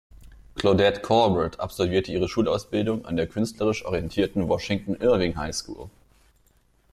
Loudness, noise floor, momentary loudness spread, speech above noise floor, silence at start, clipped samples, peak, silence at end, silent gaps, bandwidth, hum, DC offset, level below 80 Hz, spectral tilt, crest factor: -24 LUFS; -62 dBFS; 9 LU; 38 dB; 0.2 s; under 0.1%; -6 dBFS; 1.05 s; none; 15 kHz; none; under 0.1%; -46 dBFS; -5.5 dB/octave; 18 dB